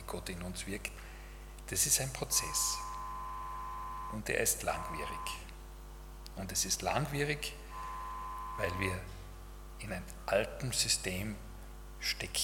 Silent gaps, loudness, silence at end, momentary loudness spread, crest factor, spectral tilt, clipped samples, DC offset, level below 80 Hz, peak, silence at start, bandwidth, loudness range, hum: none; -35 LUFS; 0 s; 20 LU; 22 dB; -2.5 dB/octave; under 0.1%; under 0.1%; -48 dBFS; -14 dBFS; 0 s; 18 kHz; 4 LU; none